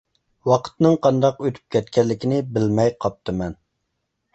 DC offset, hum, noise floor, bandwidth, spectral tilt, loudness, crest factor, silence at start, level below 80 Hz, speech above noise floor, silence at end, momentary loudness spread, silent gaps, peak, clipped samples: under 0.1%; none; -75 dBFS; 8.2 kHz; -7.5 dB/octave; -21 LUFS; 18 dB; 0.45 s; -50 dBFS; 56 dB; 0.8 s; 10 LU; none; -2 dBFS; under 0.1%